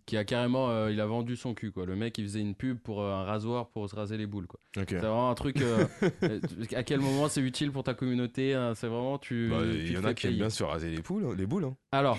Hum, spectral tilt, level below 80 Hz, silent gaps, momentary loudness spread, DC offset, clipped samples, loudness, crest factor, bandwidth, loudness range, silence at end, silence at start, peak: none; -6 dB/octave; -52 dBFS; none; 7 LU; under 0.1%; under 0.1%; -32 LUFS; 20 dB; 12.5 kHz; 5 LU; 0 s; 0.05 s; -12 dBFS